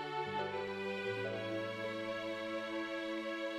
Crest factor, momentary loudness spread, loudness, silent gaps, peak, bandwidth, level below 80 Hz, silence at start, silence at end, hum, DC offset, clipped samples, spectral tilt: 14 dB; 2 LU; -40 LUFS; none; -26 dBFS; 15 kHz; -76 dBFS; 0 s; 0 s; none; under 0.1%; under 0.1%; -5.5 dB/octave